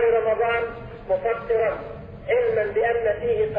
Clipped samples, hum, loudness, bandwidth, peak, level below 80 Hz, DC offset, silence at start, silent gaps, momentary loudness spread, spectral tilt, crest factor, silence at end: under 0.1%; none; -23 LUFS; 4.3 kHz; -10 dBFS; -46 dBFS; under 0.1%; 0 s; none; 12 LU; -8 dB/octave; 12 dB; 0 s